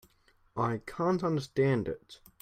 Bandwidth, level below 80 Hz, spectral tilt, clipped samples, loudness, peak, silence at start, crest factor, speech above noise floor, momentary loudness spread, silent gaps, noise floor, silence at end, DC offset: 16 kHz; -60 dBFS; -7.5 dB/octave; under 0.1%; -31 LUFS; -16 dBFS; 0.55 s; 16 dB; 36 dB; 12 LU; none; -67 dBFS; 0.25 s; under 0.1%